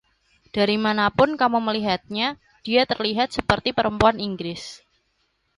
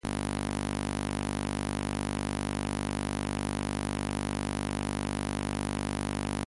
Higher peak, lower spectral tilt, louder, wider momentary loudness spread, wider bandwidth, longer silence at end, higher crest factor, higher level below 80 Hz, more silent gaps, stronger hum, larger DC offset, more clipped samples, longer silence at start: first, -2 dBFS vs -18 dBFS; about the same, -5.5 dB/octave vs -5 dB/octave; first, -22 LUFS vs -33 LUFS; first, 12 LU vs 0 LU; about the same, 11.5 kHz vs 11.5 kHz; first, 0.8 s vs 0 s; about the same, 20 dB vs 16 dB; second, -48 dBFS vs -42 dBFS; neither; neither; neither; neither; first, 0.55 s vs 0.05 s